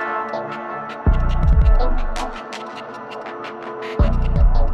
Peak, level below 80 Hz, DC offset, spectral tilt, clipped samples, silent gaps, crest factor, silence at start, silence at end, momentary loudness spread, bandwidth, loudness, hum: -4 dBFS; -18 dBFS; under 0.1%; -7 dB/octave; under 0.1%; none; 12 dB; 0 s; 0 s; 13 LU; 7.4 kHz; -22 LUFS; none